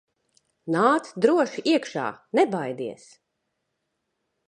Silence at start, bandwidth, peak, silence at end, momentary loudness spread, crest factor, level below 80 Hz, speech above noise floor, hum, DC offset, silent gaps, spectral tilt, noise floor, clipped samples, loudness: 0.65 s; 11 kHz; -6 dBFS; 1.55 s; 12 LU; 20 dB; -78 dBFS; 55 dB; none; under 0.1%; none; -5.5 dB/octave; -78 dBFS; under 0.1%; -24 LUFS